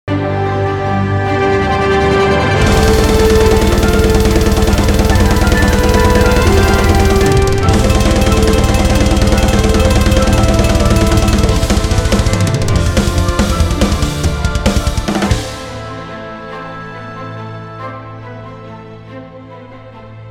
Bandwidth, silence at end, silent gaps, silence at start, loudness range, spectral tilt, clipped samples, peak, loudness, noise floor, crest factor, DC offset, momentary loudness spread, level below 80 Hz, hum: 18 kHz; 0 s; none; 0.05 s; 16 LU; -5.5 dB/octave; under 0.1%; 0 dBFS; -12 LUFS; -33 dBFS; 12 dB; under 0.1%; 16 LU; -16 dBFS; none